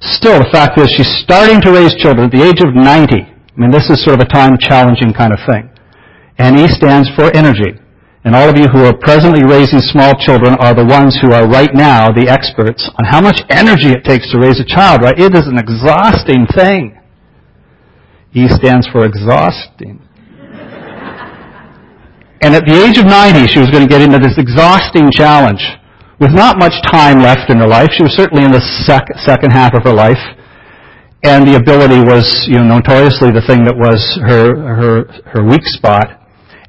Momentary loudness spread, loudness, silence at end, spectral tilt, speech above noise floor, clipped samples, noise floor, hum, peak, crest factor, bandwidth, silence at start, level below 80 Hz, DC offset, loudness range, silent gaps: 8 LU; -6 LUFS; 0.55 s; -7.5 dB/octave; 39 dB; 3%; -45 dBFS; none; 0 dBFS; 6 dB; 8 kHz; 0 s; -30 dBFS; under 0.1%; 6 LU; none